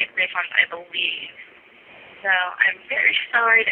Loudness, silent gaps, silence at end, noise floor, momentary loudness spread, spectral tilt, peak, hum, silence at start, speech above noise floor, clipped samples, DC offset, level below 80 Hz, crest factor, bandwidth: -19 LUFS; none; 0 s; -47 dBFS; 9 LU; -3.5 dB/octave; -2 dBFS; none; 0 s; 26 dB; under 0.1%; under 0.1%; -72 dBFS; 20 dB; 4.5 kHz